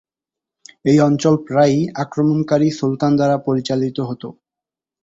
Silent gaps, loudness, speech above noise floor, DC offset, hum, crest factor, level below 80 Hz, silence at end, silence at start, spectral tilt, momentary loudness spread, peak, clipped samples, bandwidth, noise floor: none; -17 LUFS; 71 dB; under 0.1%; none; 16 dB; -56 dBFS; 0.7 s; 0.85 s; -7 dB/octave; 9 LU; -2 dBFS; under 0.1%; 7.8 kHz; -87 dBFS